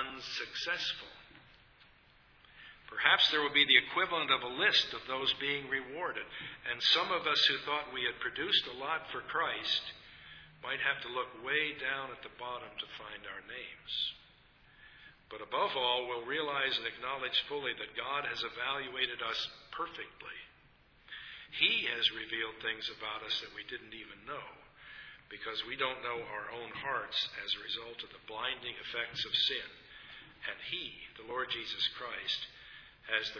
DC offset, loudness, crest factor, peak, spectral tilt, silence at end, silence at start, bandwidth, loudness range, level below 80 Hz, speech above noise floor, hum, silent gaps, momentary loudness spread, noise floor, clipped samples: under 0.1%; -33 LUFS; 28 dB; -8 dBFS; -2.5 dB/octave; 0 s; 0 s; 5.4 kHz; 11 LU; -68 dBFS; 29 dB; none; none; 20 LU; -64 dBFS; under 0.1%